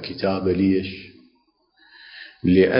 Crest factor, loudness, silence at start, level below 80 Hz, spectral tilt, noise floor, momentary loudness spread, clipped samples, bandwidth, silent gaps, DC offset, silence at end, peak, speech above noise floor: 18 dB; -22 LUFS; 0 s; -46 dBFS; -11.5 dB/octave; -64 dBFS; 21 LU; under 0.1%; 5.4 kHz; none; under 0.1%; 0 s; -4 dBFS; 45 dB